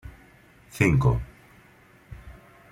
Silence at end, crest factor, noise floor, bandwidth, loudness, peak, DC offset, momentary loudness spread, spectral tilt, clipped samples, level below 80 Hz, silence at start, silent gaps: 0.4 s; 24 dB; -55 dBFS; 15 kHz; -23 LUFS; -4 dBFS; under 0.1%; 27 LU; -7.5 dB/octave; under 0.1%; -42 dBFS; 0.05 s; none